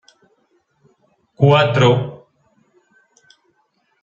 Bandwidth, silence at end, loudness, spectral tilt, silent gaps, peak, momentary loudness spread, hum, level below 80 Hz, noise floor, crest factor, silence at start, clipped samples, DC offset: 7.4 kHz; 1.85 s; -14 LUFS; -7 dB/octave; none; -2 dBFS; 9 LU; none; -58 dBFS; -65 dBFS; 18 dB; 1.4 s; under 0.1%; under 0.1%